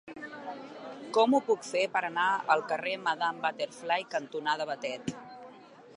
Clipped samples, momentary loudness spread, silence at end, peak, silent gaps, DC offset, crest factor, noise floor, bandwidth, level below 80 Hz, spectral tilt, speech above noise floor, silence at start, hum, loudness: under 0.1%; 18 LU; 0 s; -10 dBFS; none; under 0.1%; 20 dB; -52 dBFS; 11.5 kHz; -78 dBFS; -3.5 dB/octave; 22 dB; 0.05 s; none; -30 LUFS